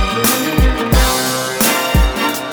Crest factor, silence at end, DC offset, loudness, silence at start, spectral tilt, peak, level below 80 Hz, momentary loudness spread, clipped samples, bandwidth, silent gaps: 14 dB; 0 s; under 0.1%; -14 LUFS; 0 s; -3.5 dB/octave; 0 dBFS; -18 dBFS; 3 LU; under 0.1%; over 20 kHz; none